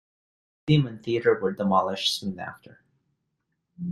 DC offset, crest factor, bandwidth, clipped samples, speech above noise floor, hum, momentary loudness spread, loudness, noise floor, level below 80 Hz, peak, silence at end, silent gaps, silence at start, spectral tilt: under 0.1%; 20 dB; 12.5 kHz; under 0.1%; 53 dB; none; 14 LU; -25 LUFS; -78 dBFS; -60 dBFS; -6 dBFS; 0 s; none; 0.65 s; -5.5 dB/octave